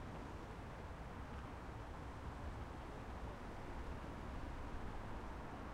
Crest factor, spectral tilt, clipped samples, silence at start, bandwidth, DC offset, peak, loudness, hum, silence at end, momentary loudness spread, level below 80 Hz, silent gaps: 14 dB; -6.5 dB/octave; under 0.1%; 0 s; 15.5 kHz; under 0.1%; -36 dBFS; -51 LUFS; none; 0 s; 2 LU; -52 dBFS; none